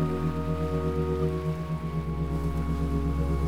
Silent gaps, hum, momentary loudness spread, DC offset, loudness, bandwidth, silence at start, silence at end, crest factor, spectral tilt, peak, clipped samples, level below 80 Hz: none; none; 3 LU; 0.9%; -29 LUFS; 13.5 kHz; 0 s; 0 s; 14 dB; -8.5 dB/octave; -14 dBFS; under 0.1%; -34 dBFS